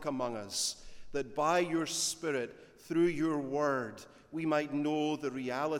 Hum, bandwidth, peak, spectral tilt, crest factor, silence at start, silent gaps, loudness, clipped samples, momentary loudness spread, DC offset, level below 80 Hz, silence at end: none; 17 kHz; -16 dBFS; -4 dB/octave; 16 dB; 0 s; none; -33 LUFS; under 0.1%; 11 LU; under 0.1%; -64 dBFS; 0 s